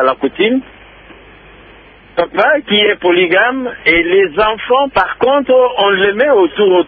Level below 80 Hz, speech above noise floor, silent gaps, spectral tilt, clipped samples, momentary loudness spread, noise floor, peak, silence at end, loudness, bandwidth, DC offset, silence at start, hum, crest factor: -44 dBFS; 28 dB; none; -7.5 dB/octave; under 0.1%; 5 LU; -40 dBFS; 0 dBFS; 0 s; -12 LUFS; 4.9 kHz; under 0.1%; 0 s; none; 12 dB